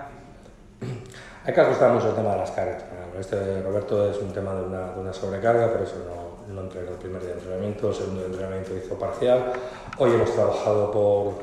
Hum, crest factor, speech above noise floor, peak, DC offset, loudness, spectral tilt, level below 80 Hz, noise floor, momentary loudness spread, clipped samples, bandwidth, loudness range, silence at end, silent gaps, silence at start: none; 20 dB; 23 dB; -4 dBFS; under 0.1%; -25 LUFS; -7 dB/octave; -52 dBFS; -47 dBFS; 15 LU; under 0.1%; 11.5 kHz; 4 LU; 0 s; none; 0 s